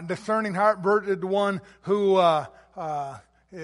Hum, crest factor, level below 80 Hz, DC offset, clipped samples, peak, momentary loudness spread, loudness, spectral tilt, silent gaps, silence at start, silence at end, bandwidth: none; 18 dB; -66 dBFS; under 0.1%; under 0.1%; -8 dBFS; 14 LU; -24 LUFS; -6 dB/octave; none; 0 s; 0 s; 11.5 kHz